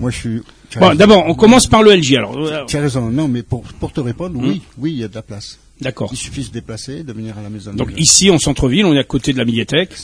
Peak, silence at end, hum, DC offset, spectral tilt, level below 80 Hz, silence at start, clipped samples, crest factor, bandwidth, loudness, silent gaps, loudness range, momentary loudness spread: 0 dBFS; 0 s; none; under 0.1%; -4 dB/octave; -36 dBFS; 0 s; 0.3%; 14 dB; 11 kHz; -13 LUFS; none; 12 LU; 19 LU